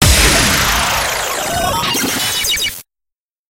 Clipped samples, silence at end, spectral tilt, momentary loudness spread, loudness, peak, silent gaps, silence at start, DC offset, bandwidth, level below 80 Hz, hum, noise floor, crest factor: under 0.1%; 0.65 s; -2 dB/octave; 8 LU; -13 LUFS; 0 dBFS; none; 0 s; under 0.1%; 17.5 kHz; -24 dBFS; none; -82 dBFS; 16 dB